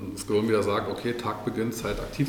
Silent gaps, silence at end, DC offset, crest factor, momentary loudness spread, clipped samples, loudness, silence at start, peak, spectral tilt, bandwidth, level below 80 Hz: none; 0 s; under 0.1%; 14 dB; 6 LU; under 0.1%; -28 LUFS; 0 s; -12 dBFS; -5.5 dB/octave; 19 kHz; -46 dBFS